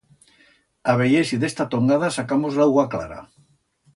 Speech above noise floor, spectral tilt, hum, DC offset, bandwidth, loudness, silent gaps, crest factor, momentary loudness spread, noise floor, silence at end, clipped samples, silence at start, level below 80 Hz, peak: 41 dB; -6 dB/octave; none; under 0.1%; 11.5 kHz; -20 LUFS; none; 18 dB; 10 LU; -61 dBFS; 0.7 s; under 0.1%; 0.85 s; -56 dBFS; -4 dBFS